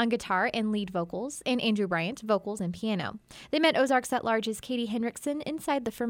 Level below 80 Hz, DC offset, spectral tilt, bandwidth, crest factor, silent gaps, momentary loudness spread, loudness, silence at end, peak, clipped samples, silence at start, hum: -64 dBFS; under 0.1%; -4.5 dB/octave; 17 kHz; 18 dB; none; 8 LU; -29 LUFS; 0 s; -10 dBFS; under 0.1%; 0 s; none